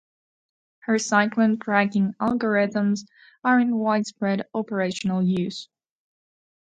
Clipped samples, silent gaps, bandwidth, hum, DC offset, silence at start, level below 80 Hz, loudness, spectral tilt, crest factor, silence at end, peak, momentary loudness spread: under 0.1%; none; 9.2 kHz; none; under 0.1%; 0.9 s; -66 dBFS; -23 LUFS; -5.5 dB/octave; 20 dB; 1.05 s; -4 dBFS; 8 LU